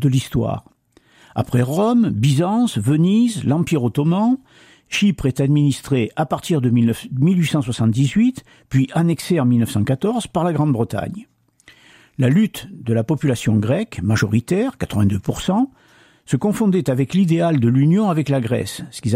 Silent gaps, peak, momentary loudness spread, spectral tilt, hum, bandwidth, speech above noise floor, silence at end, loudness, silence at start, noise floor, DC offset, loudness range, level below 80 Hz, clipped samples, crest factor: none; -4 dBFS; 7 LU; -7 dB/octave; none; 16 kHz; 37 dB; 0 s; -18 LUFS; 0 s; -54 dBFS; under 0.1%; 3 LU; -48 dBFS; under 0.1%; 14 dB